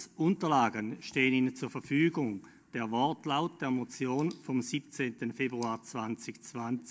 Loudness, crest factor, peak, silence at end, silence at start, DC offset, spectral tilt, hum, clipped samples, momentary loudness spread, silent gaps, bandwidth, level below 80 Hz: -33 LUFS; 20 dB; -14 dBFS; 0 s; 0 s; under 0.1%; -5.5 dB/octave; none; under 0.1%; 11 LU; none; 8 kHz; -76 dBFS